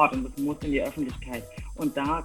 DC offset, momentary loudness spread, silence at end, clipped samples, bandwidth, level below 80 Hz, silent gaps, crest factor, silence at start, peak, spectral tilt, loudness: under 0.1%; 10 LU; 0 s; under 0.1%; 17 kHz; -42 dBFS; none; 22 dB; 0 s; -6 dBFS; -6 dB/octave; -30 LUFS